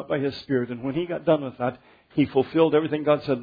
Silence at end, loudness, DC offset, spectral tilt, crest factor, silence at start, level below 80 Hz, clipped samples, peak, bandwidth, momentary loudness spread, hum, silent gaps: 0 s; -24 LUFS; under 0.1%; -9 dB/octave; 16 dB; 0 s; -60 dBFS; under 0.1%; -6 dBFS; 5 kHz; 9 LU; none; none